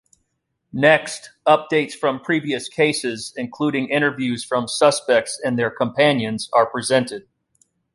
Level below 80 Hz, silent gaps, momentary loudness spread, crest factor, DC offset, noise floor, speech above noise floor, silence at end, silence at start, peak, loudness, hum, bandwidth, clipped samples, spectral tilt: -64 dBFS; none; 10 LU; 18 dB; under 0.1%; -74 dBFS; 54 dB; 0.75 s; 0.75 s; -2 dBFS; -20 LUFS; none; 11.5 kHz; under 0.1%; -4 dB/octave